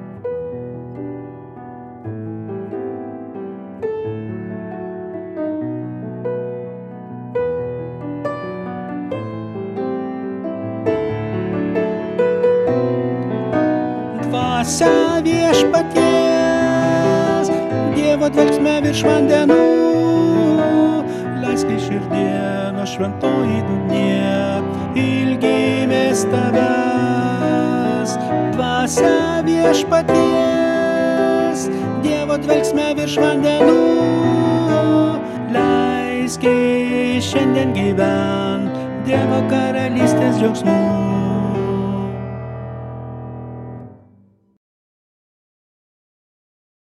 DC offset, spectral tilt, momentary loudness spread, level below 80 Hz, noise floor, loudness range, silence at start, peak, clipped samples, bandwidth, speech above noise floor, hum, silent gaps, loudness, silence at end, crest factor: under 0.1%; -6 dB/octave; 14 LU; -48 dBFS; -52 dBFS; 12 LU; 0 s; 0 dBFS; under 0.1%; 13.5 kHz; 38 dB; none; none; -17 LUFS; 2.9 s; 18 dB